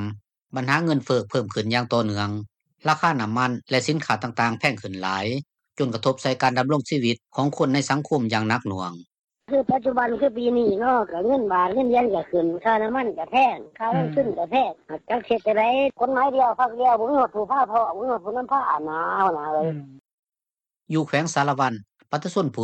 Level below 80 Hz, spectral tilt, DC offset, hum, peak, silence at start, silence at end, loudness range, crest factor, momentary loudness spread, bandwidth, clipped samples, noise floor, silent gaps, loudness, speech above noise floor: -62 dBFS; -5.5 dB/octave; under 0.1%; none; -6 dBFS; 0 s; 0 s; 3 LU; 18 dB; 8 LU; 10.5 kHz; under 0.1%; under -90 dBFS; 9.24-9.28 s, 20.13-20.23 s; -23 LUFS; over 68 dB